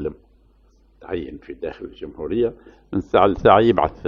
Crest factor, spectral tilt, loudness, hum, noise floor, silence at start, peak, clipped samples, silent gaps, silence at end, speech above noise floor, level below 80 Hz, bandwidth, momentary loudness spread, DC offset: 20 dB; -8 dB/octave; -19 LUFS; none; -55 dBFS; 0 s; 0 dBFS; under 0.1%; none; 0 s; 35 dB; -44 dBFS; 6.6 kHz; 19 LU; under 0.1%